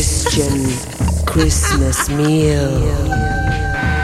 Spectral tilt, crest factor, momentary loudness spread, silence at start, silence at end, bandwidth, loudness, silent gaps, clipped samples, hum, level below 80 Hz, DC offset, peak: -4.5 dB/octave; 14 dB; 4 LU; 0 s; 0 s; 15.5 kHz; -16 LUFS; none; under 0.1%; none; -22 dBFS; under 0.1%; -2 dBFS